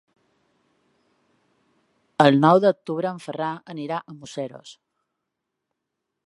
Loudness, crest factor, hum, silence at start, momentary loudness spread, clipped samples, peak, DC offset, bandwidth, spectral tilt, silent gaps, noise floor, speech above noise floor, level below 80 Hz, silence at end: -22 LUFS; 24 dB; none; 2.2 s; 19 LU; under 0.1%; 0 dBFS; under 0.1%; 11.5 kHz; -7 dB/octave; none; -82 dBFS; 60 dB; -74 dBFS; 1.55 s